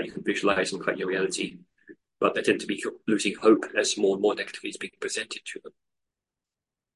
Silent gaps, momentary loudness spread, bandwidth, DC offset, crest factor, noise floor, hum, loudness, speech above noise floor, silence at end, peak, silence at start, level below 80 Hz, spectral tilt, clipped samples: none; 12 LU; 11.5 kHz; under 0.1%; 22 dB; -89 dBFS; none; -26 LUFS; 63 dB; 1.25 s; -6 dBFS; 0 s; -70 dBFS; -3.5 dB/octave; under 0.1%